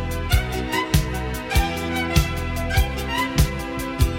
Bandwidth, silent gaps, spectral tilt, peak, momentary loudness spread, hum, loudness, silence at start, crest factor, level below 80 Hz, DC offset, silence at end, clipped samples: 17 kHz; none; -5 dB/octave; -4 dBFS; 5 LU; none; -23 LUFS; 0 s; 18 dB; -26 dBFS; under 0.1%; 0 s; under 0.1%